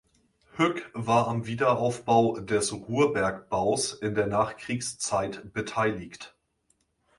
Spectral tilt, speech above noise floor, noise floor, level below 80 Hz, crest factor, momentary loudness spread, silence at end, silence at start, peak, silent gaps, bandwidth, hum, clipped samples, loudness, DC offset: -4.5 dB/octave; 45 dB; -72 dBFS; -58 dBFS; 20 dB; 10 LU; 0.9 s; 0.55 s; -8 dBFS; none; 11.5 kHz; none; under 0.1%; -27 LUFS; under 0.1%